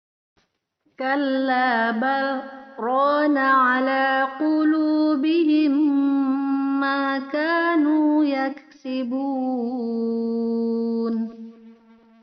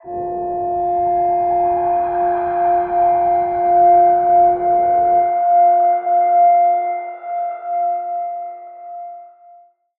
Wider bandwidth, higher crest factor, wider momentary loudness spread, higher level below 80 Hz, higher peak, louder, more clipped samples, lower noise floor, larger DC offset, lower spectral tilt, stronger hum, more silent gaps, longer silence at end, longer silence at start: first, 5.6 kHz vs 2.6 kHz; about the same, 14 dB vs 12 dB; second, 9 LU vs 13 LU; second, -76 dBFS vs -52 dBFS; second, -8 dBFS vs -4 dBFS; second, -21 LUFS vs -16 LUFS; neither; first, -69 dBFS vs -47 dBFS; neither; second, -2.5 dB/octave vs -11 dB/octave; neither; neither; second, 0.5 s vs 0.7 s; first, 1 s vs 0.05 s